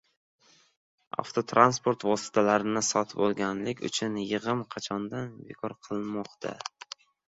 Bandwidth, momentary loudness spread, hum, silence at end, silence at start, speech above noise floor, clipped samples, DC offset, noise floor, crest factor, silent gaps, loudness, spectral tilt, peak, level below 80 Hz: 8.4 kHz; 16 LU; none; 0.6 s; 1.2 s; 20 dB; under 0.1%; under 0.1%; -48 dBFS; 26 dB; none; -29 LUFS; -4 dB/octave; -4 dBFS; -68 dBFS